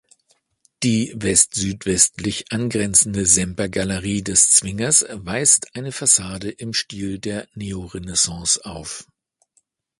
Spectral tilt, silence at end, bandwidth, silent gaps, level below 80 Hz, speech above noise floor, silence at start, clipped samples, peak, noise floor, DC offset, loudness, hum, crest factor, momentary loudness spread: -2.5 dB/octave; 1 s; 12 kHz; none; -46 dBFS; 45 dB; 0.8 s; under 0.1%; 0 dBFS; -66 dBFS; under 0.1%; -17 LUFS; none; 22 dB; 15 LU